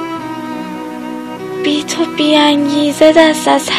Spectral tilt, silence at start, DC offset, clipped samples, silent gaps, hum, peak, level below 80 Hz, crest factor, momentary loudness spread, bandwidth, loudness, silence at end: -3.5 dB/octave; 0 s; under 0.1%; 0.4%; none; none; 0 dBFS; -54 dBFS; 12 dB; 16 LU; 14 kHz; -12 LUFS; 0 s